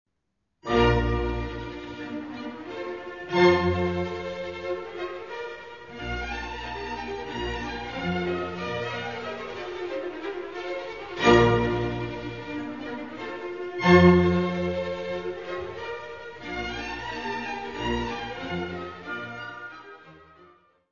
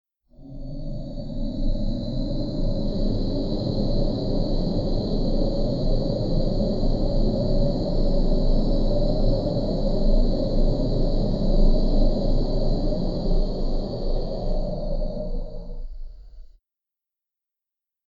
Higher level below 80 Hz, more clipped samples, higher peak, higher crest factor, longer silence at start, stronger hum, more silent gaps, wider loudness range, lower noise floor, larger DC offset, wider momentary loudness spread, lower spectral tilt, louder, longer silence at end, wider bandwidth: second, -42 dBFS vs -24 dBFS; neither; first, -4 dBFS vs -8 dBFS; first, 22 dB vs 14 dB; first, 0.65 s vs 0.4 s; neither; neither; about the same, 9 LU vs 7 LU; second, -78 dBFS vs -88 dBFS; first, 0.2% vs under 0.1%; first, 16 LU vs 10 LU; second, -6.5 dB/octave vs -9 dB/octave; about the same, -27 LUFS vs -26 LUFS; second, 0.4 s vs 1.65 s; first, 7.2 kHz vs 5.4 kHz